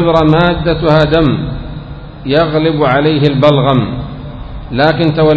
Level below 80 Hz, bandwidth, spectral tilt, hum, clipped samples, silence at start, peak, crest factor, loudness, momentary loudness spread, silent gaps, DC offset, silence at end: -28 dBFS; 8 kHz; -8.5 dB/octave; none; 0.4%; 0 s; 0 dBFS; 12 dB; -11 LUFS; 17 LU; none; under 0.1%; 0 s